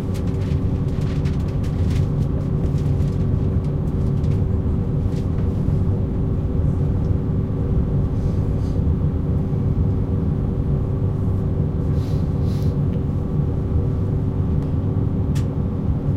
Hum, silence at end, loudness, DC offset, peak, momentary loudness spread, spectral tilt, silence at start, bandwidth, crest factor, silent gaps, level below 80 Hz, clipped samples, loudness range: none; 0 s; -21 LUFS; under 0.1%; -6 dBFS; 2 LU; -10 dB/octave; 0 s; 7.8 kHz; 14 dB; none; -26 dBFS; under 0.1%; 0 LU